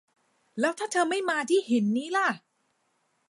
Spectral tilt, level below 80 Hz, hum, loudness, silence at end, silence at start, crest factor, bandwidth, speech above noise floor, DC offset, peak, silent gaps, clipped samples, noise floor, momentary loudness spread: -4 dB/octave; -82 dBFS; none; -27 LUFS; 0.9 s; 0.55 s; 16 dB; 11.5 kHz; 47 dB; under 0.1%; -12 dBFS; none; under 0.1%; -73 dBFS; 5 LU